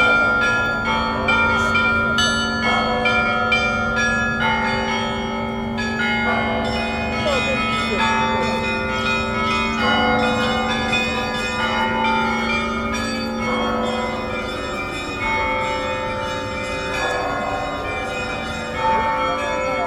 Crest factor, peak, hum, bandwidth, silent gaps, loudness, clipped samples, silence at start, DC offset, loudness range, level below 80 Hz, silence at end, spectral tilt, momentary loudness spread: 16 dB; -4 dBFS; none; 13.5 kHz; none; -20 LUFS; under 0.1%; 0 s; under 0.1%; 5 LU; -38 dBFS; 0 s; -4 dB/octave; 8 LU